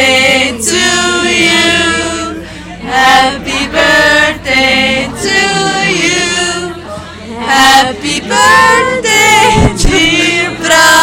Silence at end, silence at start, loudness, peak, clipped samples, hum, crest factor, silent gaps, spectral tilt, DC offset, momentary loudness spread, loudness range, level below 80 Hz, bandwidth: 0 s; 0 s; -8 LUFS; 0 dBFS; 1%; none; 10 dB; none; -2.5 dB/octave; under 0.1%; 13 LU; 3 LU; -26 dBFS; over 20 kHz